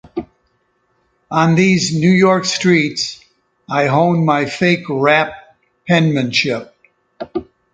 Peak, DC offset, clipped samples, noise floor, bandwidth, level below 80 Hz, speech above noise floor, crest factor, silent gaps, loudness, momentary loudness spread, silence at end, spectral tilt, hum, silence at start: 0 dBFS; under 0.1%; under 0.1%; -63 dBFS; 9.2 kHz; -54 dBFS; 49 dB; 16 dB; none; -15 LUFS; 14 LU; 0.3 s; -5.5 dB/octave; none; 0.15 s